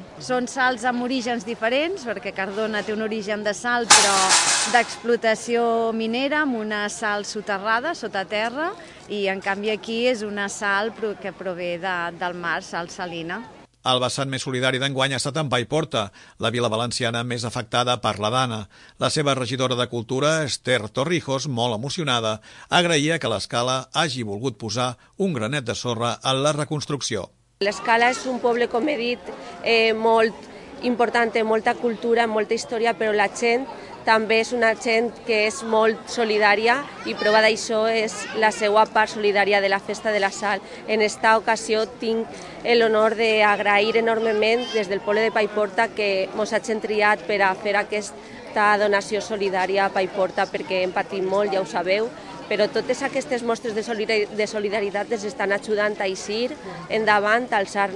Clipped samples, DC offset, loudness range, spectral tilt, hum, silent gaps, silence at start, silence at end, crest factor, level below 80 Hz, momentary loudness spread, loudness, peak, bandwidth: under 0.1%; under 0.1%; 5 LU; -3 dB/octave; none; none; 0 s; 0 s; 22 dB; -60 dBFS; 9 LU; -22 LUFS; 0 dBFS; 11.5 kHz